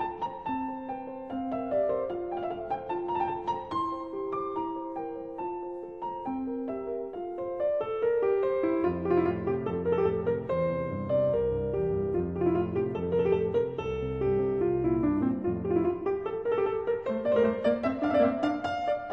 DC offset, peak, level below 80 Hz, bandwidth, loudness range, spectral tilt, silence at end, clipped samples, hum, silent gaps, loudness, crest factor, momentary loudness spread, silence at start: under 0.1%; -12 dBFS; -52 dBFS; 6.6 kHz; 6 LU; -9 dB/octave; 0 s; under 0.1%; none; none; -30 LUFS; 18 dB; 9 LU; 0 s